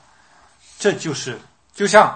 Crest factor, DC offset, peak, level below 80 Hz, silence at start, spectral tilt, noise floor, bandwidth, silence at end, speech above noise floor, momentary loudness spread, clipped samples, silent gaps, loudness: 20 dB; 0.1%; 0 dBFS; -62 dBFS; 0.8 s; -3.5 dB/octave; -53 dBFS; 9.4 kHz; 0 s; 36 dB; 16 LU; under 0.1%; none; -19 LUFS